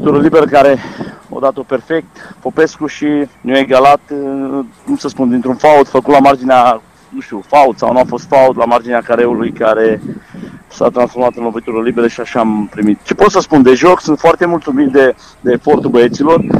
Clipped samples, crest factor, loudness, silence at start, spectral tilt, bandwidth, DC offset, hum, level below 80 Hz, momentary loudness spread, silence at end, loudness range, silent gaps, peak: 0.3%; 10 dB; -11 LUFS; 0 s; -6 dB/octave; 14 kHz; under 0.1%; none; -44 dBFS; 12 LU; 0 s; 4 LU; none; 0 dBFS